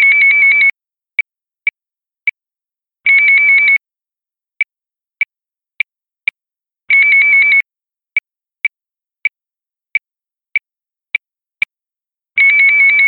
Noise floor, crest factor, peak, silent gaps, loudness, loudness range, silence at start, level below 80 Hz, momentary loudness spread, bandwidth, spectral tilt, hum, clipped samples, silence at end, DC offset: -90 dBFS; 14 dB; 0 dBFS; none; -11 LUFS; 10 LU; 0 s; -72 dBFS; 15 LU; 4.4 kHz; -2 dB/octave; none; under 0.1%; 0 s; under 0.1%